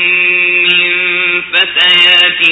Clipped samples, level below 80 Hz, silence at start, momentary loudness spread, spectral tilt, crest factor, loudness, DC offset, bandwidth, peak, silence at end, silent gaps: 0.3%; -54 dBFS; 0 s; 6 LU; -2 dB/octave; 10 dB; -7 LUFS; under 0.1%; 8 kHz; 0 dBFS; 0 s; none